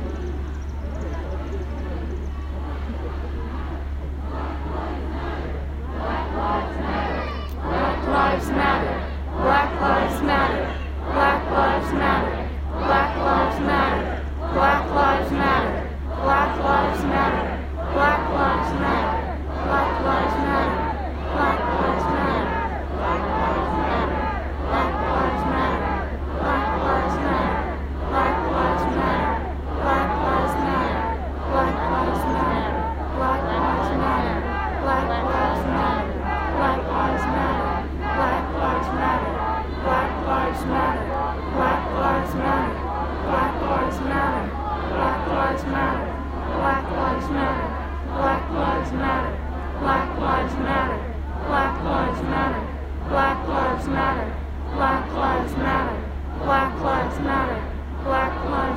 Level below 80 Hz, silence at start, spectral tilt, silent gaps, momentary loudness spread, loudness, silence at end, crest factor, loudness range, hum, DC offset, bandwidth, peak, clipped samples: -30 dBFS; 0 s; -7 dB/octave; none; 9 LU; -23 LUFS; 0 s; 18 dB; 3 LU; none; under 0.1%; 15.5 kHz; -4 dBFS; under 0.1%